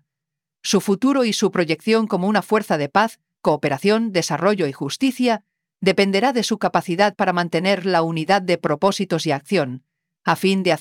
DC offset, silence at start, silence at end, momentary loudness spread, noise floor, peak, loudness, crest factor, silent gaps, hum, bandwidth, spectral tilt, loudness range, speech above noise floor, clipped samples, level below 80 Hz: under 0.1%; 0.65 s; 0 s; 4 LU; -85 dBFS; -2 dBFS; -20 LUFS; 18 dB; none; none; 17 kHz; -5 dB/octave; 1 LU; 66 dB; under 0.1%; -68 dBFS